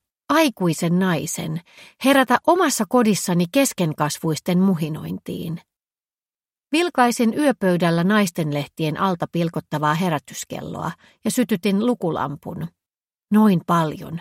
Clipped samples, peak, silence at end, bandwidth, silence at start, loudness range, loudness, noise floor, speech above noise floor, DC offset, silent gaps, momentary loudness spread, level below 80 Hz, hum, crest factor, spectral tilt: under 0.1%; -2 dBFS; 0 s; 16.5 kHz; 0.3 s; 5 LU; -20 LUFS; under -90 dBFS; over 70 dB; under 0.1%; none; 13 LU; -60 dBFS; none; 18 dB; -5.5 dB/octave